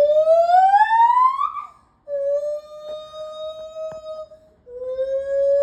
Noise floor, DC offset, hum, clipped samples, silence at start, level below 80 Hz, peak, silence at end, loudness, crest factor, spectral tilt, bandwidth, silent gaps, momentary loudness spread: -45 dBFS; under 0.1%; none; under 0.1%; 0 s; -60 dBFS; -6 dBFS; 0 s; -18 LUFS; 14 dB; -2.5 dB/octave; 9 kHz; none; 20 LU